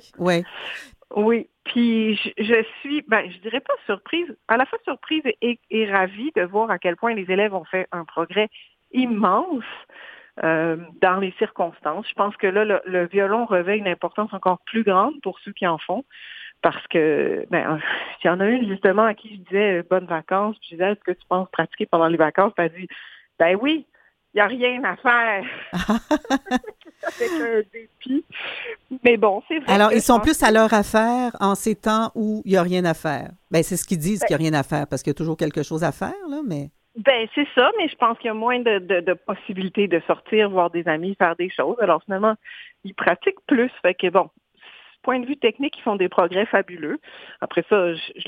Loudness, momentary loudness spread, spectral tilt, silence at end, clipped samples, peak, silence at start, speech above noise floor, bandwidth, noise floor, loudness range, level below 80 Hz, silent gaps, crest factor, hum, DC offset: -21 LUFS; 11 LU; -5 dB/octave; 0.05 s; under 0.1%; 0 dBFS; 0.2 s; 27 dB; 16.5 kHz; -48 dBFS; 5 LU; -52 dBFS; none; 22 dB; none; under 0.1%